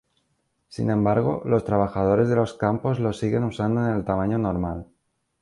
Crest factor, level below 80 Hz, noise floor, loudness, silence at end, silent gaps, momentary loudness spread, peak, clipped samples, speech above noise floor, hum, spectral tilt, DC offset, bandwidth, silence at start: 16 dB; -46 dBFS; -72 dBFS; -23 LUFS; 0.55 s; none; 7 LU; -6 dBFS; under 0.1%; 49 dB; none; -8.5 dB/octave; under 0.1%; 11 kHz; 0.7 s